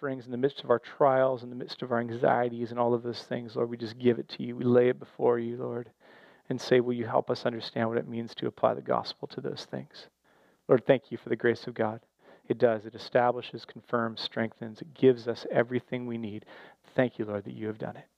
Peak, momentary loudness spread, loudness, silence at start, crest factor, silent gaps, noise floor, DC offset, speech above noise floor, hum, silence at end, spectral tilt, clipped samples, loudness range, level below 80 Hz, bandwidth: -8 dBFS; 13 LU; -30 LUFS; 0 s; 22 dB; none; -65 dBFS; under 0.1%; 36 dB; none; 0.15 s; -7 dB/octave; under 0.1%; 3 LU; -78 dBFS; 8.6 kHz